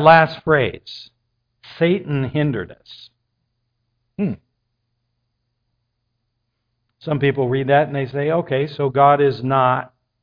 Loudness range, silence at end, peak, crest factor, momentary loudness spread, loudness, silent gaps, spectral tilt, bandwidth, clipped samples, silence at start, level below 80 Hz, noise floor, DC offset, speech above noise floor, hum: 16 LU; 0.35 s; 0 dBFS; 20 dB; 21 LU; -18 LUFS; none; -9 dB/octave; 5.2 kHz; under 0.1%; 0 s; -56 dBFS; -73 dBFS; under 0.1%; 56 dB; none